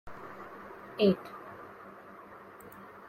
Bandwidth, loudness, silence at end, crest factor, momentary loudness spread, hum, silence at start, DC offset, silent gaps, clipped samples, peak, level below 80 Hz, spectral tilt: 16 kHz; -30 LUFS; 0 s; 22 dB; 22 LU; none; 0.05 s; under 0.1%; none; under 0.1%; -14 dBFS; -68 dBFS; -7.5 dB/octave